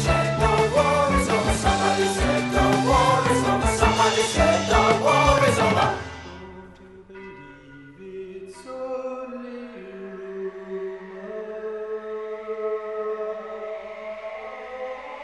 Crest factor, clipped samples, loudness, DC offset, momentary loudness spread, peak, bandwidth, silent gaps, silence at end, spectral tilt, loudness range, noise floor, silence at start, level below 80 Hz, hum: 18 dB; under 0.1%; -22 LUFS; under 0.1%; 20 LU; -4 dBFS; 11.5 kHz; none; 0 s; -4.5 dB/octave; 17 LU; -45 dBFS; 0 s; -36 dBFS; 50 Hz at -55 dBFS